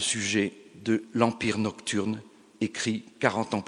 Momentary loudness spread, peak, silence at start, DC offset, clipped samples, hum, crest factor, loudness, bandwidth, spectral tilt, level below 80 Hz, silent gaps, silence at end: 8 LU; -4 dBFS; 0 s; under 0.1%; under 0.1%; none; 24 dB; -28 LUFS; 11 kHz; -4 dB/octave; -66 dBFS; none; 0 s